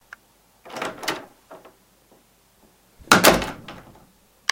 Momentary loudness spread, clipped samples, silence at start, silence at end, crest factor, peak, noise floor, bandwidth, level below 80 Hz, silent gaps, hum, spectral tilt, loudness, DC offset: 25 LU; under 0.1%; 0.65 s; 0.75 s; 26 dB; 0 dBFS; -59 dBFS; 17 kHz; -48 dBFS; none; none; -2.5 dB/octave; -19 LUFS; under 0.1%